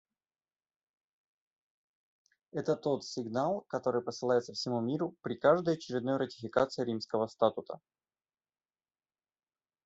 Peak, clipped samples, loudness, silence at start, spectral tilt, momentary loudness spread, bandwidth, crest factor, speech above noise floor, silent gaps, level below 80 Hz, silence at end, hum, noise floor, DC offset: -12 dBFS; under 0.1%; -33 LUFS; 2.55 s; -6 dB/octave; 7 LU; 8 kHz; 22 dB; over 58 dB; none; -76 dBFS; 2.1 s; none; under -90 dBFS; under 0.1%